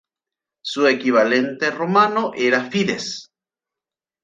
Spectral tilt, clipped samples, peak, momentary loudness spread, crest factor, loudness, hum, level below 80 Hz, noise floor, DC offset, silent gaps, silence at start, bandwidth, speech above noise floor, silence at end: -4.5 dB/octave; under 0.1%; -2 dBFS; 12 LU; 18 dB; -19 LUFS; none; -66 dBFS; -89 dBFS; under 0.1%; none; 0.65 s; 9.2 kHz; 71 dB; 1 s